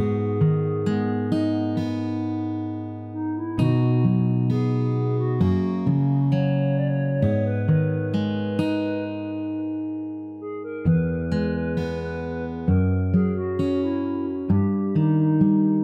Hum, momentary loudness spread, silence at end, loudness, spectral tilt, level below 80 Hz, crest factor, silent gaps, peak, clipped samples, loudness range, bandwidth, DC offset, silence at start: none; 9 LU; 0 s; -23 LUFS; -10 dB/octave; -48 dBFS; 14 dB; none; -8 dBFS; under 0.1%; 4 LU; 7.6 kHz; under 0.1%; 0 s